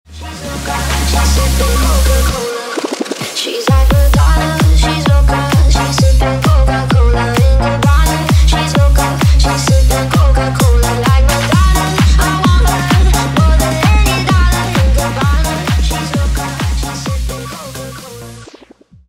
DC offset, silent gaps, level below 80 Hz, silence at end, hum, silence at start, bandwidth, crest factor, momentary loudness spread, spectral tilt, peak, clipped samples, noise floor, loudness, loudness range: under 0.1%; none; -14 dBFS; 0.65 s; none; 0.1 s; 16.5 kHz; 10 dB; 8 LU; -5 dB/octave; 0 dBFS; under 0.1%; -42 dBFS; -12 LUFS; 4 LU